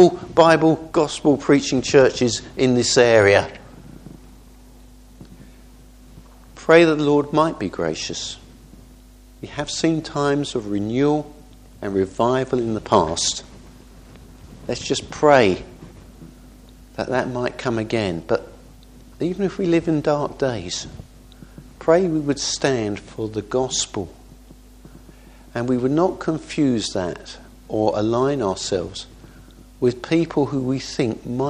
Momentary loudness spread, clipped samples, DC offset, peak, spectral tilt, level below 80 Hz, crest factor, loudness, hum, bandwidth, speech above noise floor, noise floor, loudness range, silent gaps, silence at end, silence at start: 16 LU; under 0.1%; under 0.1%; 0 dBFS; -5 dB/octave; -46 dBFS; 22 dB; -20 LUFS; none; 11.5 kHz; 26 dB; -46 dBFS; 7 LU; none; 0 s; 0 s